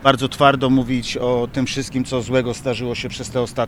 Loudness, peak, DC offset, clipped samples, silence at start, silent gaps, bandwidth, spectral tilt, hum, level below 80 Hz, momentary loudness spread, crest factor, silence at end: -20 LUFS; 0 dBFS; under 0.1%; under 0.1%; 0 s; none; 14 kHz; -5.5 dB/octave; none; -42 dBFS; 8 LU; 20 dB; 0 s